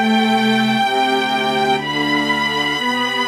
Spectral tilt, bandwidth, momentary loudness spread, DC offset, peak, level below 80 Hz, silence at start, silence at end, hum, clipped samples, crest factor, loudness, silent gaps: -4 dB/octave; 15 kHz; 3 LU; under 0.1%; -4 dBFS; -54 dBFS; 0 s; 0 s; none; under 0.1%; 12 dB; -16 LUFS; none